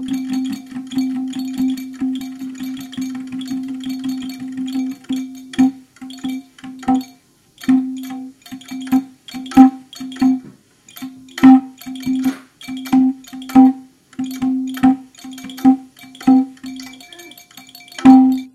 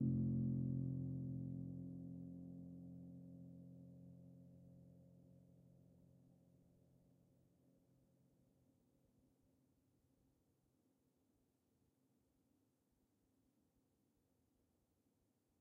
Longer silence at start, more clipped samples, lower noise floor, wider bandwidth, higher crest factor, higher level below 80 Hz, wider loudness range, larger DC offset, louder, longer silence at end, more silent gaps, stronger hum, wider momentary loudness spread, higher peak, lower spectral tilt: about the same, 0 s vs 0 s; neither; second, -50 dBFS vs -83 dBFS; first, 13 kHz vs 1.2 kHz; about the same, 18 dB vs 22 dB; first, -56 dBFS vs -76 dBFS; second, 9 LU vs 21 LU; neither; first, -17 LUFS vs -47 LUFS; second, 0.05 s vs 9.25 s; neither; neither; second, 22 LU vs 25 LU; first, 0 dBFS vs -30 dBFS; second, -5 dB/octave vs -16 dB/octave